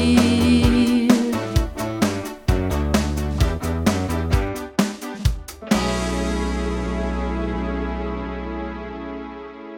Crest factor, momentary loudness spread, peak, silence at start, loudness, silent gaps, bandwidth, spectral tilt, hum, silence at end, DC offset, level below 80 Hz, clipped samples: 20 dB; 13 LU; 0 dBFS; 0 s; -22 LUFS; none; 18 kHz; -6 dB/octave; none; 0 s; under 0.1%; -28 dBFS; under 0.1%